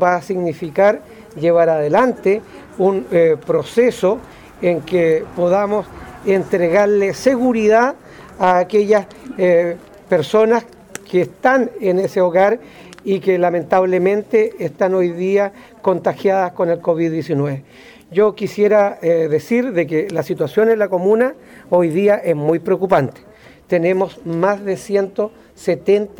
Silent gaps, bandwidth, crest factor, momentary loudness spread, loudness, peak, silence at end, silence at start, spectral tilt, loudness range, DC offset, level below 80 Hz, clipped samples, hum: none; 18.5 kHz; 14 dB; 8 LU; -16 LUFS; -2 dBFS; 0.1 s; 0 s; -7 dB/octave; 2 LU; under 0.1%; -54 dBFS; under 0.1%; none